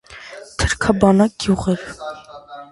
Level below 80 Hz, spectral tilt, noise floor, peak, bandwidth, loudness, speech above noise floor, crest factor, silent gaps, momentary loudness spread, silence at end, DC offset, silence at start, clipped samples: -34 dBFS; -5.5 dB/octave; -38 dBFS; 0 dBFS; 11.5 kHz; -17 LUFS; 21 dB; 20 dB; none; 22 LU; 0.05 s; under 0.1%; 0.1 s; under 0.1%